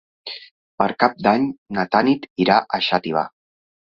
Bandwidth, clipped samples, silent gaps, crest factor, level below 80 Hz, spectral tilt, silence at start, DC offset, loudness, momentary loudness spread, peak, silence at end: 6.8 kHz; under 0.1%; 0.51-0.78 s, 1.58-1.66 s, 2.30-2.36 s; 20 dB; -60 dBFS; -7 dB/octave; 0.25 s; under 0.1%; -19 LUFS; 16 LU; -2 dBFS; 0.7 s